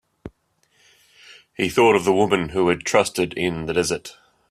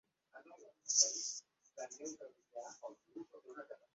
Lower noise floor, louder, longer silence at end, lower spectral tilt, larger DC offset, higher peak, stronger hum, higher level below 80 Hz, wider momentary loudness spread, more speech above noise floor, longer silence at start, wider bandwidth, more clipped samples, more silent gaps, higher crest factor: about the same, -65 dBFS vs -62 dBFS; first, -20 LUFS vs -36 LUFS; first, 0.4 s vs 0.2 s; first, -4.5 dB/octave vs 1 dB/octave; neither; first, -2 dBFS vs -16 dBFS; neither; first, -52 dBFS vs under -90 dBFS; second, 10 LU vs 23 LU; first, 45 dB vs 19 dB; about the same, 0.25 s vs 0.35 s; first, 15 kHz vs 8 kHz; neither; neither; second, 20 dB vs 28 dB